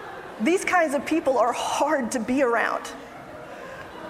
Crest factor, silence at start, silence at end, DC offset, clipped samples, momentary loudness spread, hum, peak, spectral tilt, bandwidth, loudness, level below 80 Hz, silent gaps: 16 dB; 0 s; 0 s; under 0.1%; under 0.1%; 18 LU; none; -8 dBFS; -3.5 dB/octave; 15.5 kHz; -23 LUFS; -60 dBFS; none